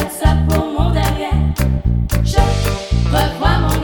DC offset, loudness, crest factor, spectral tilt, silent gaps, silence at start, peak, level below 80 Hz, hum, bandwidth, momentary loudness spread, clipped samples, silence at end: under 0.1%; -16 LUFS; 14 dB; -6 dB/octave; none; 0 s; 0 dBFS; -18 dBFS; none; 19.5 kHz; 3 LU; under 0.1%; 0 s